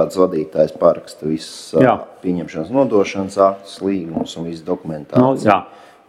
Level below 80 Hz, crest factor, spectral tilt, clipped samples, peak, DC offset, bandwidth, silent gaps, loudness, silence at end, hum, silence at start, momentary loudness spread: -56 dBFS; 18 dB; -6.5 dB/octave; under 0.1%; 0 dBFS; under 0.1%; 13.5 kHz; none; -18 LUFS; 0.4 s; none; 0 s; 10 LU